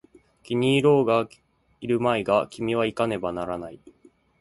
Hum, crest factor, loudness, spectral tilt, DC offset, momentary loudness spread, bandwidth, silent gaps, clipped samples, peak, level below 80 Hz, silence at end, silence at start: none; 18 dB; -24 LUFS; -6.5 dB/octave; under 0.1%; 15 LU; 11.5 kHz; none; under 0.1%; -6 dBFS; -58 dBFS; 0.5 s; 0.5 s